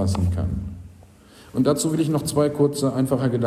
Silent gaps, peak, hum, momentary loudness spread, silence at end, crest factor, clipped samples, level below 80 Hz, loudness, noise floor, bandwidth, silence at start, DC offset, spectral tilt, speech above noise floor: none; -6 dBFS; none; 11 LU; 0 s; 16 dB; under 0.1%; -42 dBFS; -22 LUFS; -48 dBFS; 15 kHz; 0 s; under 0.1%; -6.5 dB/octave; 27 dB